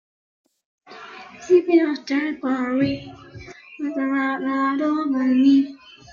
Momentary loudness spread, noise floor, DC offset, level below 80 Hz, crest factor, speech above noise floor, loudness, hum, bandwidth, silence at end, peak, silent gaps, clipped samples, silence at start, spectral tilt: 24 LU; -40 dBFS; under 0.1%; -60 dBFS; 16 dB; 20 dB; -21 LUFS; none; 7.2 kHz; 0 s; -6 dBFS; none; under 0.1%; 0.9 s; -6 dB/octave